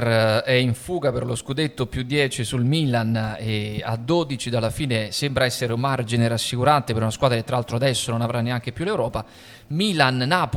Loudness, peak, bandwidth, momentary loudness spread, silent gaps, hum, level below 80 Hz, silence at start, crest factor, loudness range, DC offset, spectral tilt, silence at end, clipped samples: -22 LUFS; -2 dBFS; 16 kHz; 7 LU; none; none; -48 dBFS; 0 s; 20 dB; 2 LU; under 0.1%; -5 dB/octave; 0 s; under 0.1%